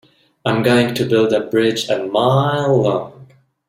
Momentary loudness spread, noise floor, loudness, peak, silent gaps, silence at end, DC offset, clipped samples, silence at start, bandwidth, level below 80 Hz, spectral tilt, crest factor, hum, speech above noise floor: 6 LU; -45 dBFS; -16 LUFS; -2 dBFS; none; 0.45 s; under 0.1%; under 0.1%; 0.45 s; 15.5 kHz; -54 dBFS; -6 dB/octave; 14 dB; none; 30 dB